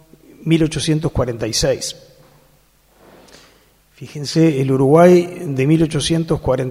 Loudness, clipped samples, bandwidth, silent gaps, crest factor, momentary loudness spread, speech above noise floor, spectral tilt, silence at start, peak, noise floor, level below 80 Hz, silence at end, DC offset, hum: -16 LUFS; under 0.1%; 15 kHz; none; 18 dB; 15 LU; 39 dB; -6 dB/octave; 0.4 s; 0 dBFS; -54 dBFS; -40 dBFS; 0 s; under 0.1%; none